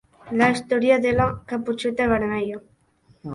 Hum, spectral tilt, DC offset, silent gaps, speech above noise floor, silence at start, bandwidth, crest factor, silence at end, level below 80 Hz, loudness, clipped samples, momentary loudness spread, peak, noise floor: none; -6 dB/octave; under 0.1%; none; 38 dB; 0.25 s; 11.5 kHz; 18 dB; 0 s; -46 dBFS; -22 LUFS; under 0.1%; 11 LU; -4 dBFS; -59 dBFS